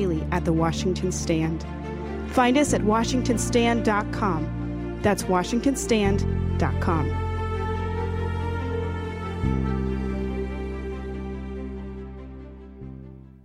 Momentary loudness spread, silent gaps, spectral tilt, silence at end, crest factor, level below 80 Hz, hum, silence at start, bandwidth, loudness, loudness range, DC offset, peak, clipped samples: 15 LU; none; -6 dB/octave; 0.2 s; 18 dB; -34 dBFS; none; 0 s; 16 kHz; -25 LUFS; 7 LU; under 0.1%; -8 dBFS; under 0.1%